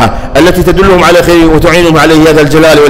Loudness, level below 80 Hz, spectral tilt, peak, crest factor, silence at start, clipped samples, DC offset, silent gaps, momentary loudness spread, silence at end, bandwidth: -4 LUFS; -18 dBFS; -5.5 dB/octave; 0 dBFS; 4 dB; 0 s; 0.4%; under 0.1%; none; 3 LU; 0 s; 16.5 kHz